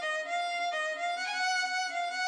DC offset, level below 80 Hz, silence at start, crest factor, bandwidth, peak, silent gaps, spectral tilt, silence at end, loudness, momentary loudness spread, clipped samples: under 0.1%; under -90 dBFS; 0 s; 12 dB; 11 kHz; -22 dBFS; none; 3.5 dB/octave; 0 s; -31 LUFS; 3 LU; under 0.1%